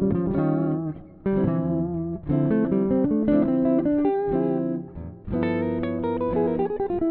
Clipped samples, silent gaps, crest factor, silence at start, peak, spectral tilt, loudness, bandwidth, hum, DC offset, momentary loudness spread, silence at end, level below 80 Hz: under 0.1%; none; 14 dB; 0 s; -10 dBFS; -9.5 dB/octave; -24 LUFS; 4.2 kHz; none; under 0.1%; 8 LU; 0 s; -46 dBFS